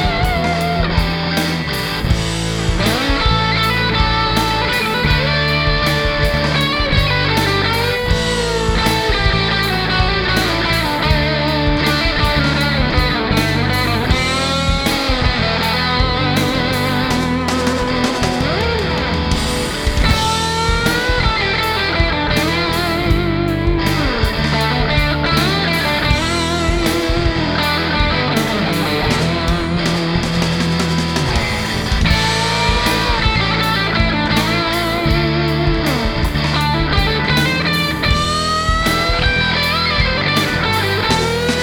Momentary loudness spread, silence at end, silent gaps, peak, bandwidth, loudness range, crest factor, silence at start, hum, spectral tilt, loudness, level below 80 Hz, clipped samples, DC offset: 3 LU; 0 s; none; 0 dBFS; over 20 kHz; 2 LU; 16 dB; 0 s; none; -4.5 dB/octave; -15 LUFS; -24 dBFS; under 0.1%; under 0.1%